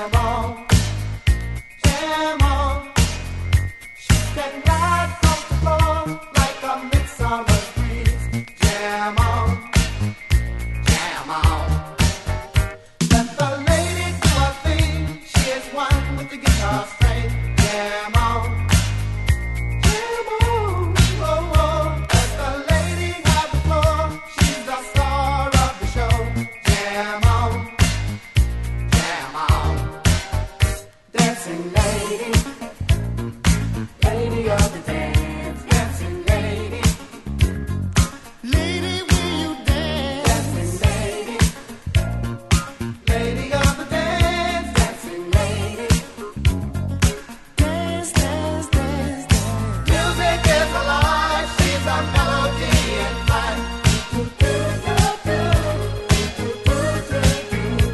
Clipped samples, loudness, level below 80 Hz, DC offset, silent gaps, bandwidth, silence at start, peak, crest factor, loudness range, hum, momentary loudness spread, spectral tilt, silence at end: under 0.1%; -20 LUFS; -24 dBFS; under 0.1%; none; 12.5 kHz; 0 s; -2 dBFS; 18 dB; 3 LU; none; 7 LU; -5 dB/octave; 0 s